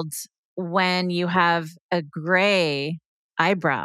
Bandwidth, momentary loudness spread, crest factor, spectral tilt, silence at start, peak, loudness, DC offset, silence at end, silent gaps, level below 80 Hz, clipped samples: 15 kHz; 14 LU; 20 dB; -5 dB/octave; 0 s; -4 dBFS; -22 LUFS; under 0.1%; 0 s; 0.38-0.56 s, 1.81-1.89 s, 3.06-3.30 s; -72 dBFS; under 0.1%